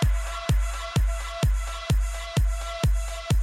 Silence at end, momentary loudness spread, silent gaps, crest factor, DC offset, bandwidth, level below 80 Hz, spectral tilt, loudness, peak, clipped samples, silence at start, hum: 0 s; 3 LU; none; 14 dB; under 0.1%; 15.5 kHz; -26 dBFS; -5 dB/octave; -27 LUFS; -10 dBFS; under 0.1%; 0 s; none